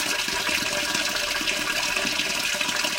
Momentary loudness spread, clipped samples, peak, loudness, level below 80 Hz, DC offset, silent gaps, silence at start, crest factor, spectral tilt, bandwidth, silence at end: 1 LU; under 0.1%; -8 dBFS; -23 LUFS; -52 dBFS; under 0.1%; none; 0 s; 18 dB; -0.5 dB/octave; 17 kHz; 0 s